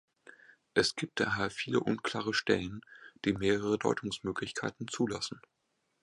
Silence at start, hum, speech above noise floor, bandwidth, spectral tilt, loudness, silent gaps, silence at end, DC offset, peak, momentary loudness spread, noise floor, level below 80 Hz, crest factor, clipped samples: 0.75 s; none; 47 dB; 11.5 kHz; -4.5 dB/octave; -33 LUFS; none; 0.65 s; under 0.1%; -12 dBFS; 8 LU; -79 dBFS; -62 dBFS; 22 dB; under 0.1%